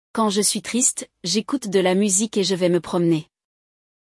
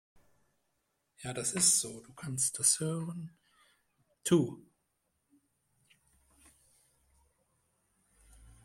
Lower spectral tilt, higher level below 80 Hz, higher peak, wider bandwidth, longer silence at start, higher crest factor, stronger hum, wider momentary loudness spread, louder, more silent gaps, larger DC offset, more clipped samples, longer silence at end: about the same, -3.5 dB/octave vs -3 dB/octave; about the same, -66 dBFS vs -70 dBFS; first, -6 dBFS vs -12 dBFS; second, 12 kHz vs 16.5 kHz; second, 0.15 s vs 1.2 s; second, 16 dB vs 26 dB; neither; second, 5 LU vs 20 LU; first, -20 LUFS vs -30 LUFS; neither; neither; neither; first, 0.95 s vs 0.2 s